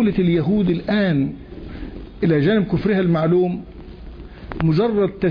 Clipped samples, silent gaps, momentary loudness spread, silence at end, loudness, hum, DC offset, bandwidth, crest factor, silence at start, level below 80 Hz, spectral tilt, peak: under 0.1%; none; 21 LU; 0 s; -19 LUFS; none; under 0.1%; 5.2 kHz; 12 dB; 0 s; -40 dBFS; -10 dB/octave; -6 dBFS